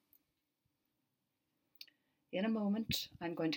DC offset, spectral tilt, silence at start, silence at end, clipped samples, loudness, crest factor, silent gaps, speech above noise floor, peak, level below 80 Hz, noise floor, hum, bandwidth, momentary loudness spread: under 0.1%; -5 dB/octave; 1.8 s; 0 s; under 0.1%; -39 LUFS; 20 dB; none; 48 dB; -24 dBFS; -70 dBFS; -86 dBFS; none; 17.5 kHz; 21 LU